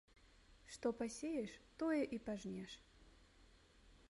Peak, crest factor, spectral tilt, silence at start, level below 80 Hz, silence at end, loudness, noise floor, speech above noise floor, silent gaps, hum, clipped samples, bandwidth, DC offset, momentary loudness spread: -28 dBFS; 20 dB; -5 dB/octave; 0.25 s; -70 dBFS; 0.05 s; -45 LUFS; -68 dBFS; 24 dB; none; none; under 0.1%; 11.5 kHz; under 0.1%; 17 LU